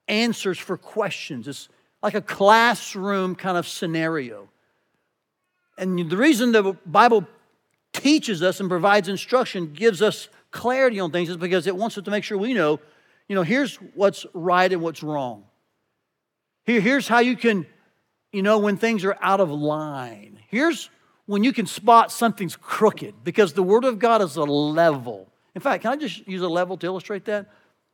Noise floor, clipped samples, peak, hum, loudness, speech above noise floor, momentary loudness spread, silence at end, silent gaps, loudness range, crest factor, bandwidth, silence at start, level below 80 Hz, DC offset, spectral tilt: -79 dBFS; under 0.1%; -2 dBFS; none; -21 LUFS; 58 dB; 13 LU; 0.5 s; none; 4 LU; 20 dB; 18.5 kHz; 0.1 s; -84 dBFS; under 0.1%; -5 dB/octave